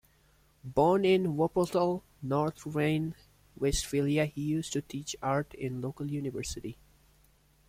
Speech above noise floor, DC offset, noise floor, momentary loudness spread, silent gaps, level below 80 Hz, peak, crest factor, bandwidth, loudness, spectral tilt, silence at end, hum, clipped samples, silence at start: 35 dB; under 0.1%; -65 dBFS; 12 LU; none; -52 dBFS; -14 dBFS; 18 dB; 16 kHz; -31 LUFS; -5.5 dB/octave; 0.95 s; none; under 0.1%; 0.65 s